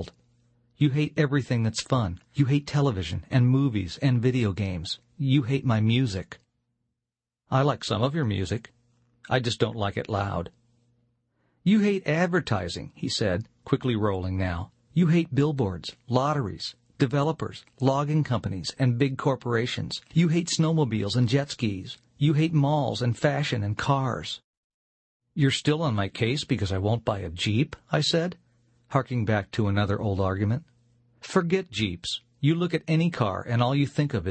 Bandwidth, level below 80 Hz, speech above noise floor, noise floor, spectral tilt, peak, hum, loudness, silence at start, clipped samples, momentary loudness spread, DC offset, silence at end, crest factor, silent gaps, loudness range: 8.8 kHz; -54 dBFS; 63 dB; -88 dBFS; -6.5 dB/octave; -6 dBFS; none; -26 LUFS; 0 s; under 0.1%; 9 LU; under 0.1%; 0 s; 20 dB; 24.44-25.20 s; 3 LU